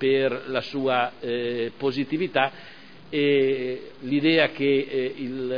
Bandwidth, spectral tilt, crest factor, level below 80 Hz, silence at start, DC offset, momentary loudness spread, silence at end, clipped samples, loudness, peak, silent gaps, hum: 5.2 kHz; -7.5 dB/octave; 20 dB; -66 dBFS; 0 s; 0.4%; 10 LU; 0 s; under 0.1%; -24 LUFS; -6 dBFS; none; none